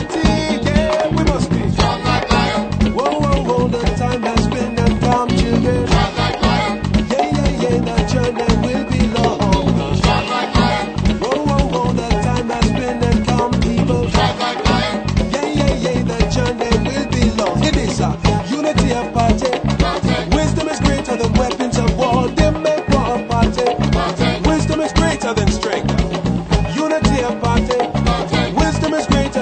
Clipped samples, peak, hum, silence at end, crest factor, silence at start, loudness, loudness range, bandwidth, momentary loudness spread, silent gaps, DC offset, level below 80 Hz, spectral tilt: under 0.1%; 0 dBFS; none; 0 s; 16 dB; 0 s; -16 LUFS; 1 LU; 9.2 kHz; 3 LU; none; under 0.1%; -24 dBFS; -6 dB/octave